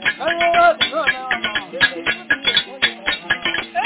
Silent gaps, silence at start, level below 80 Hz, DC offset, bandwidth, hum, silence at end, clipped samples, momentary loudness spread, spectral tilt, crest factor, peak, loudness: none; 0 s; -52 dBFS; under 0.1%; 4 kHz; none; 0 s; under 0.1%; 7 LU; -6 dB/octave; 16 dB; -4 dBFS; -17 LUFS